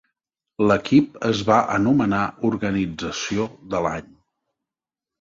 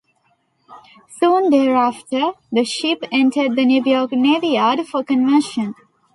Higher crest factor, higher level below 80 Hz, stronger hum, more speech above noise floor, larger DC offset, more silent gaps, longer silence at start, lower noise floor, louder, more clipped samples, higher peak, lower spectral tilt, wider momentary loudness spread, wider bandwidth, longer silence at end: first, 20 dB vs 14 dB; first, -50 dBFS vs -68 dBFS; neither; first, 69 dB vs 47 dB; neither; neither; about the same, 0.6 s vs 0.7 s; first, -89 dBFS vs -63 dBFS; second, -21 LUFS vs -17 LUFS; neither; about the same, -4 dBFS vs -4 dBFS; first, -6 dB/octave vs -4 dB/octave; about the same, 9 LU vs 7 LU; second, 7.6 kHz vs 11.5 kHz; first, 1.2 s vs 0.45 s